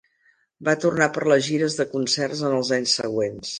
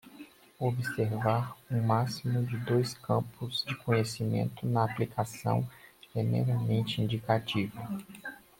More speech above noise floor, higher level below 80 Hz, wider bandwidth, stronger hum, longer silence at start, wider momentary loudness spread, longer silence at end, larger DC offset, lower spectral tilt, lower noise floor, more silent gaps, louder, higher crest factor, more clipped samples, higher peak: first, 41 dB vs 22 dB; about the same, -62 dBFS vs -64 dBFS; second, 10 kHz vs 16.5 kHz; neither; first, 0.6 s vs 0.05 s; second, 5 LU vs 10 LU; second, 0 s vs 0.25 s; neither; second, -3.5 dB/octave vs -6.5 dB/octave; first, -64 dBFS vs -52 dBFS; neither; first, -22 LUFS vs -31 LUFS; about the same, 18 dB vs 18 dB; neither; first, -4 dBFS vs -12 dBFS